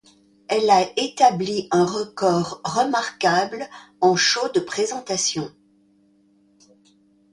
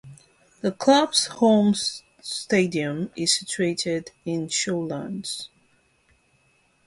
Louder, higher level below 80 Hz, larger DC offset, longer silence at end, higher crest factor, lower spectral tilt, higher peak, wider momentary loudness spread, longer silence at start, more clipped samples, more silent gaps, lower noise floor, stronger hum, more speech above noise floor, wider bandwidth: about the same, -21 LUFS vs -23 LUFS; about the same, -64 dBFS vs -64 dBFS; neither; first, 1.85 s vs 1.4 s; about the same, 18 dB vs 20 dB; about the same, -3.5 dB/octave vs -3.5 dB/octave; about the same, -4 dBFS vs -4 dBFS; second, 8 LU vs 13 LU; first, 0.5 s vs 0.05 s; neither; neither; second, -59 dBFS vs -64 dBFS; neither; about the same, 38 dB vs 41 dB; about the same, 11.5 kHz vs 11.5 kHz